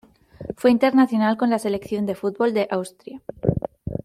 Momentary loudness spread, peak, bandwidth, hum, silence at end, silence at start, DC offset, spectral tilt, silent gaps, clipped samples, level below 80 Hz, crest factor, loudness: 18 LU; -4 dBFS; 13.5 kHz; none; 0.05 s; 0.4 s; under 0.1%; -7 dB/octave; none; under 0.1%; -48 dBFS; 18 dB; -21 LUFS